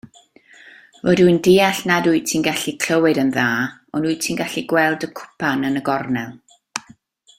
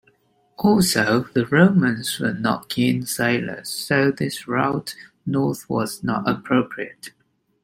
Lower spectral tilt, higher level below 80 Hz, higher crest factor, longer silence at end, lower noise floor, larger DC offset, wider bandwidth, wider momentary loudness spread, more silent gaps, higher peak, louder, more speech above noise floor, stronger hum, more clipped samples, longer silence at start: about the same, -4.5 dB/octave vs -5 dB/octave; about the same, -58 dBFS vs -56 dBFS; about the same, 18 dB vs 18 dB; about the same, 0.6 s vs 0.55 s; second, -50 dBFS vs -61 dBFS; neither; about the same, 16.5 kHz vs 16.5 kHz; about the same, 13 LU vs 12 LU; neither; about the same, -2 dBFS vs -2 dBFS; first, -18 LUFS vs -21 LUFS; second, 32 dB vs 40 dB; neither; neither; first, 1.05 s vs 0.6 s